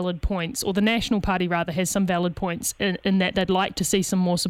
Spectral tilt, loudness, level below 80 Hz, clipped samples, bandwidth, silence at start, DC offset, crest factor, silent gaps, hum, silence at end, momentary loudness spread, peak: -4.5 dB/octave; -23 LUFS; -40 dBFS; under 0.1%; 16.5 kHz; 0 s; under 0.1%; 16 dB; none; none; 0 s; 5 LU; -8 dBFS